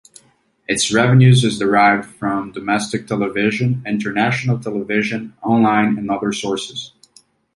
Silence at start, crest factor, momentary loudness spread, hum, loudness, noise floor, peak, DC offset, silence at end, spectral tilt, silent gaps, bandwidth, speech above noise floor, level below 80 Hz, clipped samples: 0.7 s; 16 dB; 11 LU; none; -17 LUFS; -56 dBFS; -2 dBFS; under 0.1%; 0.7 s; -5.5 dB/octave; none; 11.5 kHz; 40 dB; -54 dBFS; under 0.1%